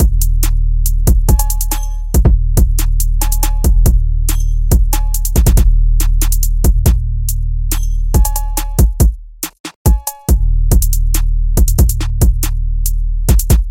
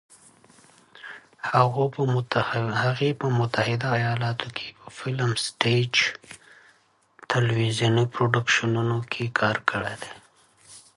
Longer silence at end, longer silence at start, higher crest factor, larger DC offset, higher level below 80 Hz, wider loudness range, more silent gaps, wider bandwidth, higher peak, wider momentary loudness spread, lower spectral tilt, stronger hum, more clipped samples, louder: second, 0 s vs 0.15 s; second, 0 s vs 1 s; second, 10 dB vs 24 dB; neither; first, -12 dBFS vs -60 dBFS; about the same, 2 LU vs 2 LU; first, 9.60-9.64 s, 9.76-9.85 s vs none; first, 17 kHz vs 11.5 kHz; about the same, 0 dBFS vs -2 dBFS; second, 6 LU vs 16 LU; about the same, -5 dB/octave vs -5 dB/octave; neither; neither; first, -15 LUFS vs -24 LUFS